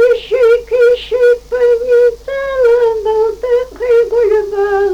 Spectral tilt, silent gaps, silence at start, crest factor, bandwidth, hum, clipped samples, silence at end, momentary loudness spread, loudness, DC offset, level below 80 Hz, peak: -4.5 dB/octave; none; 0 s; 8 dB; 7.8 kHz; none; under 0.1%; 0 s; 5 LU; -12 LUFS; under 0.1%; -40 dBFS; -4 dBFS